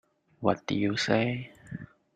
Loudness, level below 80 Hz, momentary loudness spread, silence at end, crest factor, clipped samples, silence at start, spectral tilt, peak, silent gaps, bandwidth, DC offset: -29 LUFS; -64 dBFS; 17 LU; 0.3 s; 22 dB; under 0.1%; 0.4 s; -5.5 dB/octave; -8 dBFS; none; 9.6 kHz; under 0.1%